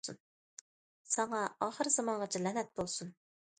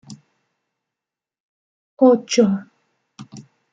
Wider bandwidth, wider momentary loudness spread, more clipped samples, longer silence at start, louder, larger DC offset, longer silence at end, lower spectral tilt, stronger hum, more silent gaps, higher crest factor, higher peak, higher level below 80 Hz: about the same, 9.4 kHz vs 9.2 kHz; first, 23 LU vs 14 LU; neither; about the same, 0.05 s vs 0.1 s; second, -36 LUFS vs -17 LUFS; neither; first, 0.5 s vs 0.3 s; second, -3 dB/octave vs -5.5 dB/octave; neither; first, 0.20-1.05 s vs 1.40-1.97 s; about the same, 22 dB vs 20 dB; second, -18 dBFS vs -2 dBFS; about the same, -72 dBFS vs -68 dBFS